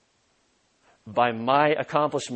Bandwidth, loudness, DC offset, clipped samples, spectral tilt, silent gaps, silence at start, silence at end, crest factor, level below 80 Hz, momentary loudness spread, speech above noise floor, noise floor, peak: 8.8 kHz; -23 LUFS; under 0.1%; under 0.1%; -5 dB/octave; none; 1.05 s; 0 s; 20 dB; -70 dBFS; 4 LU; 44 dB; -67 dBFS; -6 dBFS